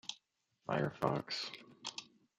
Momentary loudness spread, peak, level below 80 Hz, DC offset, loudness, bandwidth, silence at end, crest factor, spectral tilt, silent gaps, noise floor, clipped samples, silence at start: 14 LU; -16 dBFS; -74 dBFS; under 0.1%; -40 LUFS; 13.5 kHz; 0.35 s; 24 dB; -4.5 dB/octave; none; -77 dBFS; under 0.1%; 0.05 s